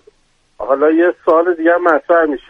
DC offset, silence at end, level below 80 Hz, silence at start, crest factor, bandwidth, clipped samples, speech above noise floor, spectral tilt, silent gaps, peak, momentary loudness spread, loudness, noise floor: under 0.1%; 0.1 s; -54 dBFS; 0.6 s; 14 dB; 4.4 kHz; under 0.1%; 45 dB; -6.5 dB/octave; none; 0 dBFS; 4 LU; -13 LUFS; -57 dBFS